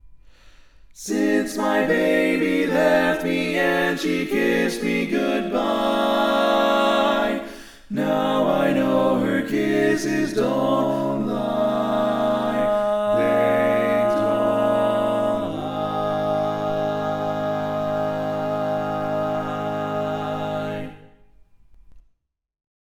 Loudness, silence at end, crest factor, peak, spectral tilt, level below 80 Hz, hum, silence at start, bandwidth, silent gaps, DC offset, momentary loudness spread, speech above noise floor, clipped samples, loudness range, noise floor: -21 LUFS; 1 s; 16 dB; -6 dBFS; -5.5 dB/octave; -50 dBFS; none; 0.05 s; 18.5 kHz; none; under 0.1%; 7 LU; 46 dB; under 0.1%; 5 LU; -67 dBFS